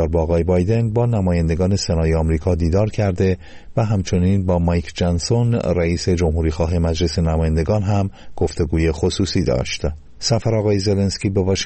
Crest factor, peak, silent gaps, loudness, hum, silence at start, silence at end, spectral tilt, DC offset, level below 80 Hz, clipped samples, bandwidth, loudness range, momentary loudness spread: 12 dB; -6 dBFS; none; -19 LUFS; none; 0 s; 0 s; -6.5 dB/octave; under 0.1%; -30 dBFS; under 0.1%; 8.8 kHz; 2 LU; 4 LU